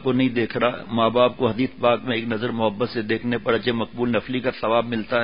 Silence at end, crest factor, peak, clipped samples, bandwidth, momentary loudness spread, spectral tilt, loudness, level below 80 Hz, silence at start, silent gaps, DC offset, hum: 0 s; 18 dB; -4 dBFS; under 0.1%; 5.4 kHz; 5 LU; -11 dB/octave; -22 LUFS; -54 dBFS; 0 s; none; 0.5%; none